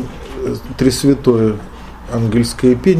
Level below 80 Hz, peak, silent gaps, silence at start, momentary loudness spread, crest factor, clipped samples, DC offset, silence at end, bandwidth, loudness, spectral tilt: -34 dBFS; 0 dBFS; none; 0 s; 14 LU; 14 dB; under 0.1%; under 0.1%; 0 s; 15.5 kHz; -15 LUFS; -6.5 dB/octave